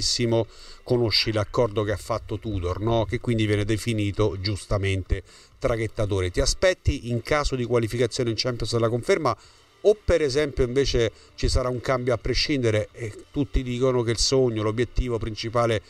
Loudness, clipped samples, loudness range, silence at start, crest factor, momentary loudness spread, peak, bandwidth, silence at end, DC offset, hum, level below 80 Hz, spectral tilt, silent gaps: -24 LUFS; under 0.1%; 2 LU; 0 s; 16 dB; 7 LU; -8 dBFS; 13.5 kHz; 0.1 s; under 0.1%; none; -34 dBFS; -5 dB/octave; none